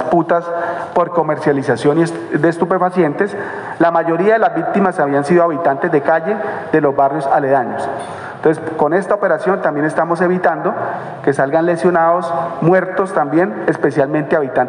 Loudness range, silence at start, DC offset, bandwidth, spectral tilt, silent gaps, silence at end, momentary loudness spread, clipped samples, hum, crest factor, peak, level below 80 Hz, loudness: 2 LU; 0 s; under 0.1%; 10.5 kHz; -7.5 dB/octave; none; 0 s; 6 LU; under 0.1%; none; 14 dB; -2 dBFS; -60 dBFS; -15 LUFS